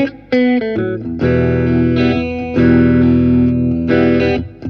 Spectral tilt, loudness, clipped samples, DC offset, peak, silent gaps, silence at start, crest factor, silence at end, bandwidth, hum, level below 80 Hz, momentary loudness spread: -9.5 dB/octave; -14 LUFS; under 0.1%; under 0.1%; 0 dBFS; none; 0 s; 12 dB; 0 s; 5.8 kHz; none; -32 dBFS; 7 LU